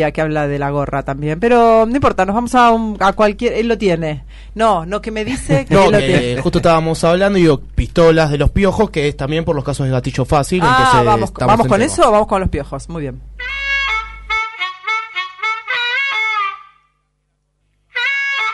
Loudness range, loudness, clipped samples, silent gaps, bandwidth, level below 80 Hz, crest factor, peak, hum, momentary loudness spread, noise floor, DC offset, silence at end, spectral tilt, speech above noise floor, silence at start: 6 LU; -15 LUFS; under 0.1%; none; 11.5 kHz; -30 dBFS; 12 dB; -2 dBFS; 50 Hz at -35 dBFS; 10 LU; -66 dBFS; under 0.1%; 0 s; -5.5 dB/octave; 52 dB; 0 s